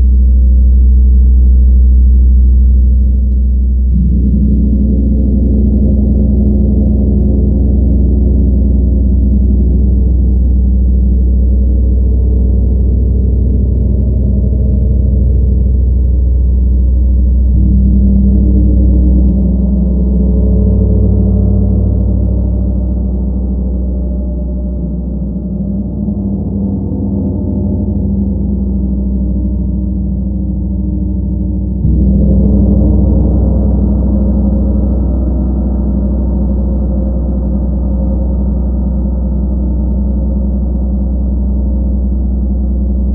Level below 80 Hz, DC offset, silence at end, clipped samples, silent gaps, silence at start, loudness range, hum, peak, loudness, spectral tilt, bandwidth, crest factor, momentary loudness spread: -10 dBFS; under 0.1%; 0 s; under 0.1%; none; 0 s; 5 LU; none; -2 dBFS; -12 LUFS; -15.5 dB/octave; 1.3 kHz; 8 dB; 7 LU